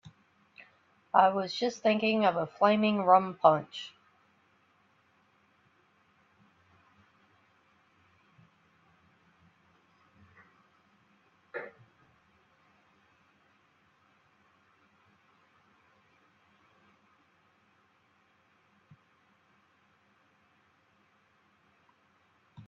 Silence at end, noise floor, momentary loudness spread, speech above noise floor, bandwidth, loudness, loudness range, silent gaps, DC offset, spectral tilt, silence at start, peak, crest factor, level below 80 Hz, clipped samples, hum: 0.05 s; -69 dBFS; 21 LU; 42 dB; 7.4 kHz; -27 LUFS; 25 LU; none; under 0.1%; -3.5 dB/octave; 1.15 s; -8 dBFS; 28 dB; -82 dBFS; under 0.1%; none